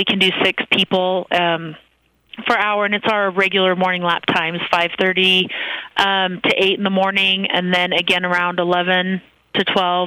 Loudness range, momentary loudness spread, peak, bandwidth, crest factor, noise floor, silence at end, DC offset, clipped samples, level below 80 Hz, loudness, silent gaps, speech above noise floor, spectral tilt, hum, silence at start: 2 LU; 6 LU; 0 dBFS; 15.5 kHz; 18 dB; -46 dBFS; 0 s; under 0.1%; under 0.1%; -58 dBFS; -16 LUFS; none; 28 dB; -5 dB/octave; none; 0 s